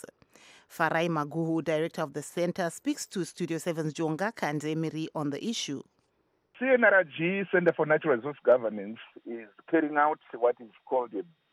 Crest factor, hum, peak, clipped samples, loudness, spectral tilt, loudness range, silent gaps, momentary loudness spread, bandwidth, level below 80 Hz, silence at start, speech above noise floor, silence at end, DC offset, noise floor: 20 dB; none; -10 dBFS; under 0.1%; -29 LUFS; -5 dB/octave; 6 LU; none; 14 LU; 15.5 kHz; -80 dBFS; 0.7 s; 44 dB; 0.3 s; under 0.1%; -73 dBFS